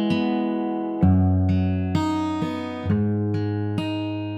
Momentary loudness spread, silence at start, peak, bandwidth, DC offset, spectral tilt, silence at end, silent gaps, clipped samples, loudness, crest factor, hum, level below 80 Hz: 7 LU; 0 s; -8 dBFS; 8.2 kHz; under 0.1%; -8.5 dB/octave; 0 s; none; under 0.1%; -23 LUFS; 14 dB; none; -46 dBFS